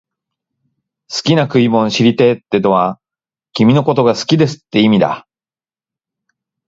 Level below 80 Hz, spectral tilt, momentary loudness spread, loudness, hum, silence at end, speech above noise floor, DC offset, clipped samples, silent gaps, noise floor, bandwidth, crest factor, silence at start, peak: -56 dBFS; -6 dB/octave; 8 LU; -13 LUFS; none; 1.5 s; over 78 dB; under 0.1%; under 0.1%; none; under -90 dBFS; 7.8 kHz; 14 dB; 1.1 s; 0 dBFS